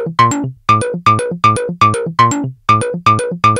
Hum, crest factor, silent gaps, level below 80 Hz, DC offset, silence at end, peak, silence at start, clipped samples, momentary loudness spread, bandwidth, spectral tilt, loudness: none; 12 dB; none; -46 dBFS; under 0.1%; 0 s; 0 dBFS; 0 s; under 0.1%; 2 LU; 15.5 kHz; -5 dB/octave; -13 LUFS